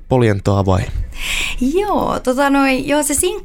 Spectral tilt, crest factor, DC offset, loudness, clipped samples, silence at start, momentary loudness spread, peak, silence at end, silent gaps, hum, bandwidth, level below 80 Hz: -5 dB/octave; 14 dB; under 0.1%; -16 LUFS; under 0.1%; 0 s; 5 LU; -2 dBFS; 0 s; none; none; 17.5 kHz; -28 dBFS